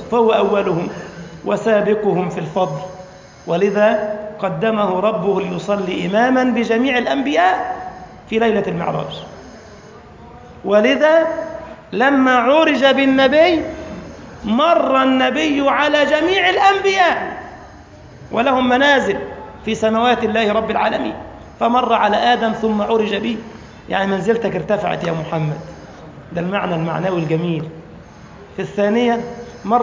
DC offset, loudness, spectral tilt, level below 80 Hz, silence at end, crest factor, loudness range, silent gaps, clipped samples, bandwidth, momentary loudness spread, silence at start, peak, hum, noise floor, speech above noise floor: under 0.1%; -16 LUFS; -5.5 dB/octave; -48 dBFS; 0 s; 16 dB; 7 LU; none; under 0.1%; 7.6 kHz; 18 LU; 0 s; -2 dBFS; none; -39 dBFS; 24 dB